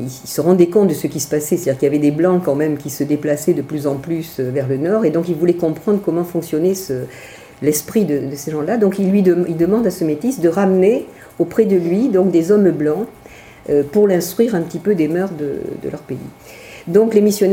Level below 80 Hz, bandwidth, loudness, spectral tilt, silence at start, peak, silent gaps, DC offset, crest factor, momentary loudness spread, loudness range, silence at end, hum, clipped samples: -54 dBFS; 17 kHz; -16 LUFS; -6.5 dB/octave; 0 s; 0 dBFS; none; under 0.1%; 16 dB; 11 LU; 3 LU; 0 s; none; under 0.1%